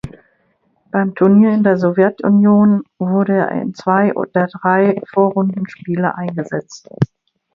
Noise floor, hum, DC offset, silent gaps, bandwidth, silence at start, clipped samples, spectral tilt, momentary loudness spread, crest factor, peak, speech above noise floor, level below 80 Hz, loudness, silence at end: -61 dBFS; none; under 0.1%; none; 7 kHz; 0.05 s; under 0.1%; -9 dB/octave; 12 LU; 14 dB; 0 dBFS; 47 dB; -56 dBFS; -15 LUFS; 0.5 s